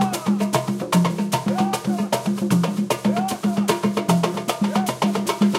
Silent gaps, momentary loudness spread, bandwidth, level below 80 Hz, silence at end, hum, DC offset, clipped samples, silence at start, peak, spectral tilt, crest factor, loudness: none; 3 LU; 16.5 kHz; -62 dBFS; 0 s; none; under 0.1%; under 0.1%; 0 s; -4 dBFS; -5.5 dB/octave; 16 dB; -21 LUFS